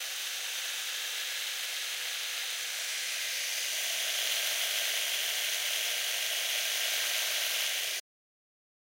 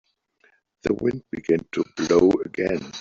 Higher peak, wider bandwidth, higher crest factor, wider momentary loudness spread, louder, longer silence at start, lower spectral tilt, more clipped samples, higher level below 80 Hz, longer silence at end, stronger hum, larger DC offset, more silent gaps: second, -16 dBFS vs -4 dBFS; first, 16 kHz vs 7.6 kHz; about the same, 18 dB vs 20 dB; second, 4 LU vs 10 LU; second, -30 LUFS vs -23 LUFS; second, 0 s vs 0.85 s; second, 5.5 dB/octave vs -6 dB/octave; neither; second, under -90 dBFS vs -54 dBFS; first, 1 s vs 0 s; neither; neither; neither